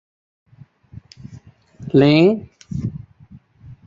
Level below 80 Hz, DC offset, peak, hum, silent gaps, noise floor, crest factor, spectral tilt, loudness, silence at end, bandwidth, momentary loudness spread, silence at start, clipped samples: -48 dBFS; under 0.1%; -2 dBFS; none; none; -46 dBFS; 18 dB; -8 dB/octave; -17 LUFS; 0.1 s; 7.4 kHz; 27 LU; 1.3 s; under 0.1%